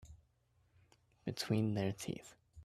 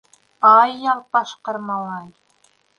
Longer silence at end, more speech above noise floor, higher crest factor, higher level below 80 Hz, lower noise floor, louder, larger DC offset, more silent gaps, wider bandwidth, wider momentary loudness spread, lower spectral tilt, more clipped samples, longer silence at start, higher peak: second, 0 s vs 0.7 s; second, 37 dB vs 42 dB; about the same, 20 dB vs 18 dB; about the same, -68 dBFS vs -72 dBFS; first, -75 dBFS vs -60 dBFS; second, -40 LUFS vs -17 LUFS; neither; neither; first, 14.5 kHz vs 9.6 kHz; second, 13 LU vs 17 LU; first, -6 dB/octave vs -4.5 dB/octave; neither; second, 0 s vs 0.4 s; second, -22 dBFS vs -2 dBFS